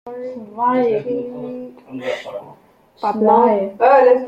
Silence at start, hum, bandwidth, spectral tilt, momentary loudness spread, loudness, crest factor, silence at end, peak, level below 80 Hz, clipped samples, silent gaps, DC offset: 0.05 s; none; 7.4 kHz; -7 dB/octave; 19 LU; -16 LUFS; 16 dB; 0 s; -2 dBFS; -64 dBFS; under 0.1%; none; under 0.1%